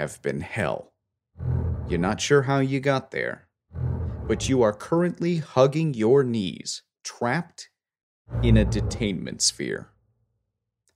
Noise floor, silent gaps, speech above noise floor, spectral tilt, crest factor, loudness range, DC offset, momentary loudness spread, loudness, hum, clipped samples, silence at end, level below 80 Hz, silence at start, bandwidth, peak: -80 dBFS; 8.03-8.25 s; 56 dB; -5 dB/octave; 20 dB; 3 LU; under 0.1%; 14 LU; -25 LUFS; none; under 0.1%; 1.15 s; -38 dBFS; 0 s; 13.5 kHz; -4 dBFS